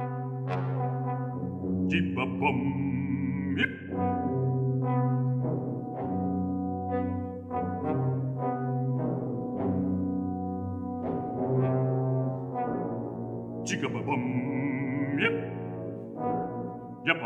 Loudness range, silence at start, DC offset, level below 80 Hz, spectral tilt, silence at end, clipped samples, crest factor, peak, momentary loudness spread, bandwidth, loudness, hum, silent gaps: 2 LU; 0 s; under 0.1%; -62 dBFS; -7.5 dB/octave; 0 s; under 0.1%; 22 dB; -8 dBFS; 7 LU; 8 kHz; -30 LUFS; none; none